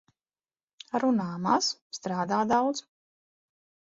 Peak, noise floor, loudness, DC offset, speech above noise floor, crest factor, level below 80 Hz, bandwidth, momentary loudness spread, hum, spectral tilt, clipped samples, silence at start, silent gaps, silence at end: -8 dBFS; under -90 dBFS; -28 LUFS; under 0.1%; over 63 dB; 22 dB; -70 dBFS; 7.8 kHz; 9 LU; none; -4.5 dB/octave; under 0.1%; 0.95 s; 1.81-1.90 s; 1.15 s